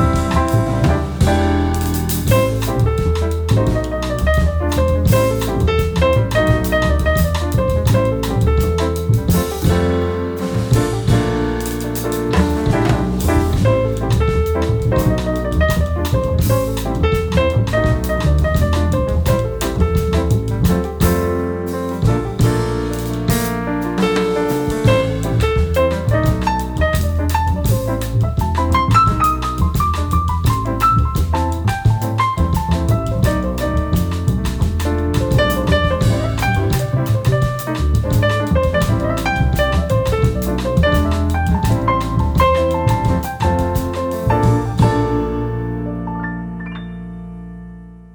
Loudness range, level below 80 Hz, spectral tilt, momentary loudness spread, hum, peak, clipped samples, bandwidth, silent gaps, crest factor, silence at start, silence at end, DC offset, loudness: 2 LU; -22 dBFS; -6.5 dB/octave; 5 LU; none; -2 dBFS; under 0.1%; over 20 kHz; none; 14 dB; 0 s; 0.05 s; under 0.1%; -17 LUFS